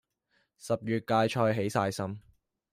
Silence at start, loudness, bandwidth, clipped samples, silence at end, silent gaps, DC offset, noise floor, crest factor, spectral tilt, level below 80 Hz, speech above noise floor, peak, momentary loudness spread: 0.65 s; -30 LUFS; 16 kHz; under 0.1%; 0.55 s; none; under 0.1%; -74 dBFS; 18 dB; -6 dB/octave; -68 dBFS; 45 dB; -12 dBFS; 13 LU